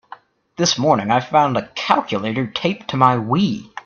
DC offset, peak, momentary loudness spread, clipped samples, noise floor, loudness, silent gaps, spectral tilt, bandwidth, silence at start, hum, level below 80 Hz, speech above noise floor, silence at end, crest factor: under 0.1%; 0 dBFS; 7 LU; under 0.1%; -43 dBFS; -18 LUFS; none; -4.5 dB/octave; 7.2 kHz; 0.6 s; none; -56 dBFS; 25 dB; 0.05 s; 18 dB